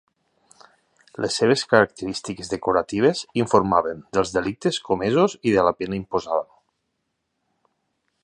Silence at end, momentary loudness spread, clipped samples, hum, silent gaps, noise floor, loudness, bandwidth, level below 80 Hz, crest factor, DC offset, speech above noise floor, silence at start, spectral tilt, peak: 1.8 s; 11 LU; under 0.1%; none; none; -76 dBFS; -22 LUFS; 11 kHz; -54 dBFS; 22 dB; under 0.1%; 55 dB; 1.2 s; -5 dB/octave; 0 dBFS